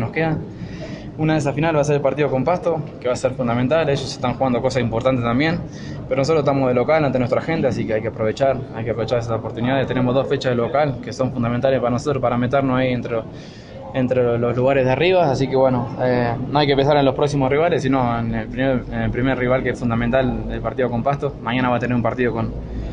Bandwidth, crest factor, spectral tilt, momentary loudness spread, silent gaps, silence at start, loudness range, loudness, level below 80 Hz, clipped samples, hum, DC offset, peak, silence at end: 10 kHz; 18 dB; -7 dB/octave; 8 LU; none; 0 s; 3 LU; -19 LUFS; -40 dBFS; under 0.1%; none; under 0.1%; -2 dBFS; 0 s